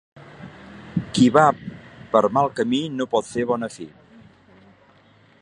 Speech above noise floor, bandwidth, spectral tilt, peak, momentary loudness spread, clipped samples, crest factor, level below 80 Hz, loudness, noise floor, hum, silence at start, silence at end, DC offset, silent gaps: 35 dB; 11 kHz; -6 dB/octave; 0 dBFS; 25 LU; under 0.1%; 22 dB; -56 dBFS; -21 LUFS; -54 dBFS; none; 0.4 s; 1.55 s; under 0.1%; none